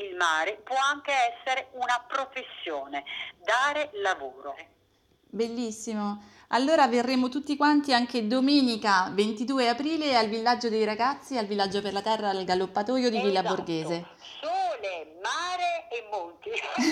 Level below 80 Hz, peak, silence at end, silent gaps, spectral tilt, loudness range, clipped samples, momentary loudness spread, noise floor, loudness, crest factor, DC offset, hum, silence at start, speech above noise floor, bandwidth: -70 dBFS; -8 dBFS; 0 s; none; -4 dB/octave; 7 LU; under 0.1%; 12 LU; -66 dBFS; -27 LUFS; 18 dB; under 0.1%; none; 0 s; 39 dB; 13 kHz